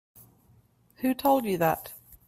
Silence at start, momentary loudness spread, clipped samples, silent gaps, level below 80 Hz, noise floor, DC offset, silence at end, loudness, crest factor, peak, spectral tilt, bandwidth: 1 s; 10 LU; under 0.1%; none; -62 dBFS; -62 dBFS; under 0.1%; 0.15 s; -27 LUFS; 18 dB; -10 dBFS; -5.5 dB/octave; 16 kHz